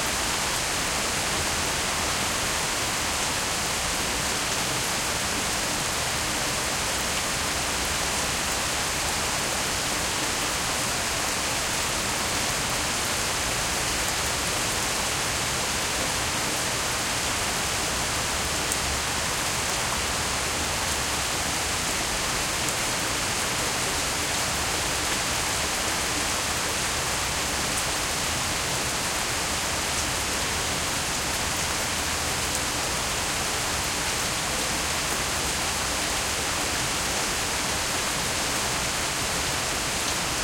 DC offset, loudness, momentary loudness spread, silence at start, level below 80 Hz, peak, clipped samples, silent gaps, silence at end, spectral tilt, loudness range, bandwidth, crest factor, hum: under 0.1%; -24 LUFS; 1 LU; 0 s; -42 dBFS; -8 dBFS; under 0.1%; none; 0 s; -1.5 dB/octave; 1 LU; 17 kHz; 20 dB; none